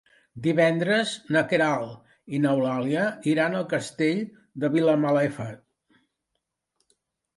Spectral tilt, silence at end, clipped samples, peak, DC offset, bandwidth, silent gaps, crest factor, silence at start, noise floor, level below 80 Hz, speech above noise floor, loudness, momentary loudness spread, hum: -6 dB/octave; 1.8 s; under 0.1%; -6 dBFS; under 0.1%; 11.5 kHz; none; 20 dB; 0.35 s; -81 dBFS; -70 dBFS; 57 dB; -24 LUFS; 9 LU; none